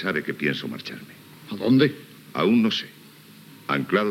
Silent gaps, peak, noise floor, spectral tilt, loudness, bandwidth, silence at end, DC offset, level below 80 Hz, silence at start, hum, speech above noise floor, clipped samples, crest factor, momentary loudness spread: none; -6 dBFS; -48 dBFS; -6.5 dB/octave; -23 LUFS; 16 kHz; 0 s; under 0.1%; -76 dBFS; 0 s; none; 25 dB; under 0.1%; 18 dB; 21 LU